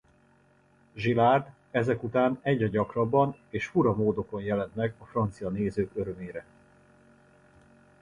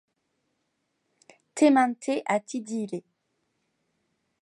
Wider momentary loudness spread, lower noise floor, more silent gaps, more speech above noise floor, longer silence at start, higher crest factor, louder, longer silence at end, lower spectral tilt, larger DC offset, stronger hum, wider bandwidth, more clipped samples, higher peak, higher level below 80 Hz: second, 11 LU vs 16 LU; second, -63 dBFS vs -77 dBFS; neither; second, 35 dB vs 53 dB; second, 0.95 s vs 1.55 s; about the same, 20 dB vs 20 dB; second, -28 LUFS vs -25 LUFS; first, 1.6 s vs 1.45 s; first, -8 dB/octave vs -4.5 dB/octave; neither; neither; about the same, 10.5 kHz vs 11.5 kHz; neither; about the same, -10 dBFS vs -8 dBFS; first, -56 dBFS vs -84 dBFS